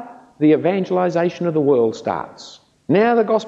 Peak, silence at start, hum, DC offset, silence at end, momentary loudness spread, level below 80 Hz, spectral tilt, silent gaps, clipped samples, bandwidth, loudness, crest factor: -4 dBFS; 0 s; none; under 0.1%; 0 s; 13 LU; -64 dBFS; -7.5 dB/octave; none; under 0.1%; 7.8 kHz; -18 LUFS; 14 dB